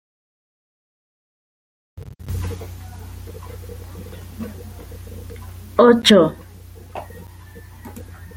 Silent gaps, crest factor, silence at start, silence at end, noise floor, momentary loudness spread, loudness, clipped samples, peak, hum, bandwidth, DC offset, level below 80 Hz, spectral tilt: none; 22 dB; 1.95 s; 0 s; -40 dBFS; 27 LU; -16 LUFS; under 0.1%; -2 dBFS; none; 17 kHz; under 0.1%; -42 dBFS; -5 dB/octave